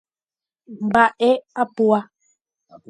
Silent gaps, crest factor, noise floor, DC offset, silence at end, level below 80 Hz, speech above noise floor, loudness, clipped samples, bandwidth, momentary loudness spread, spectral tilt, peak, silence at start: none; 20 dB; under -90 dBFS; under 0.1%; 0.85 s; -62 dBFS; over 72 dB; -19 LUFS; under 0.1%; 11 kHz; 8 LU; -6 dB/octave; -2 dBFS; 0.7 s